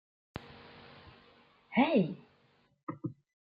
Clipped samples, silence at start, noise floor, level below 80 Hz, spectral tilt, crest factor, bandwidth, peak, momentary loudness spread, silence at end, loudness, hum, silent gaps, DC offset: under 0.1%; 0.35 s; -69 dBFS; -70 dBFS; -9.5 dB/octave; 22 dB; 5.2 kHz; -14 dBFS; 25 LU; 0.3 s; -32 LUFS; none; 2.83-2.87 s; under 0.1%